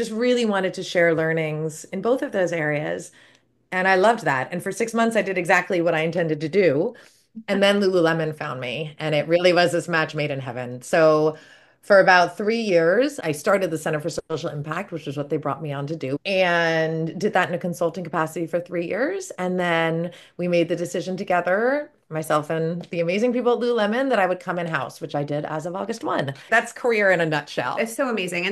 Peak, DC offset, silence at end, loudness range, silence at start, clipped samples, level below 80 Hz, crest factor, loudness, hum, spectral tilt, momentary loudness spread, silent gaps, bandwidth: -2 dBFS; under 0.1%; 0 s; 5 LU; 0 s; under 0.1%; -68 dBFS; 20 dB; -22 LUFS; none; -5 dB/octave; 11 LU; none; 12.5 kHz